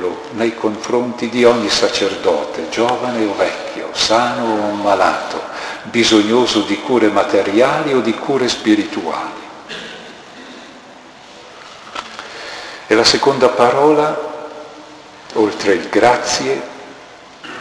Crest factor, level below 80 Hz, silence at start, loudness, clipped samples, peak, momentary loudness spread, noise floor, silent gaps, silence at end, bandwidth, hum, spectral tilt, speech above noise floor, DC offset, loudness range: 16 dB; -52 dBFS; 0 s; -15 LUFS; under 0.1%; 0 dBFS; 21 LU; -39 dBFS; none; 0 s; 11 kHz; none; -3.5 dB/octave; 24 dB; under 0.1%; 8 LU